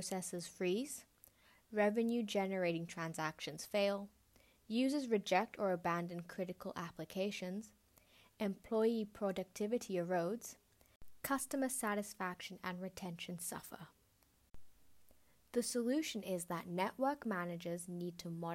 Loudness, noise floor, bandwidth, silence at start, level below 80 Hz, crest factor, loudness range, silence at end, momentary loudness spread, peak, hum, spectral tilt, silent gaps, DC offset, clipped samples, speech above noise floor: -40 LUFS; -73 dBFS; 16 kHz; 0 s; -74 dBFS; 20 dB; 5 LU; 0 s; 11 LU; -20 dBFS; none; -4.5 dB/octave; 10.96-11.00 s; under 0.1%; under 0.1%; 34 dB